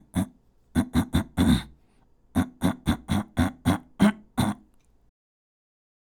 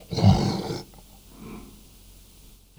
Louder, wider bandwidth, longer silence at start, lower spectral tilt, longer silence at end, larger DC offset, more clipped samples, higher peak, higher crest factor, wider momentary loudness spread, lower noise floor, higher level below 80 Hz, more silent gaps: about the same, -26 LUFS vs -24 LUFS; about the same, 19.5 kHz vs over 20 kHz; about the same, 0.15 s vs 0.1 s; about the same, -6 dB/octave vs -7 dB/octave; first, 1.55 s vs 1.1 s; neither; neither; about the same, -8 dBFS vs -6 dBFS; about the same, 20 dB vs 22 dB; second, 8 LU vs 26 LU; first, -60 dBFS vs -51 dBFS; about the same, -40 dBFS vs -42 dBFS; neither